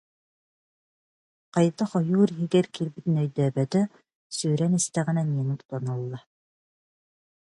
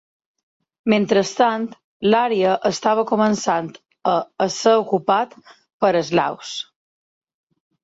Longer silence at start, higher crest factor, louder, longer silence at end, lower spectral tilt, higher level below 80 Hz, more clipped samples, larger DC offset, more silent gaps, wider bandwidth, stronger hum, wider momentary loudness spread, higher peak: first, 1.55 s vs 0.85 s; about the same, 18 dB vs 18 dB; second, -26 LUFS vs -19 LUFS; first, 1.35 s vs 1.2 s; first, -6.5 dB/octave vs -4.5 dB/octave; second, -70 dBFS vs -64 dBFS; neither; neither; about the same, 4.15-4.30 s, 5.65-5.69 s vs 1.84-2.00 s, 5.73-5.80 s; first, 11.5 kHz vs 8 kHz; neither; second, 9 LU vs 12 LU; second, -8 dBFS vs -4 dBFS